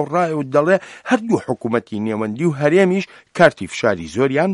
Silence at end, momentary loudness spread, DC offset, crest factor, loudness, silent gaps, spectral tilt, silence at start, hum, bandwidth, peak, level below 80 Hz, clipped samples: 0 s; 7 LU; under 0.1%; 18 dB; -18 LUFS; none; -6.5 dB/octave; 0 s; none; 11.5 kHz; 0 dBFS; -56 dBFS; under 0.1%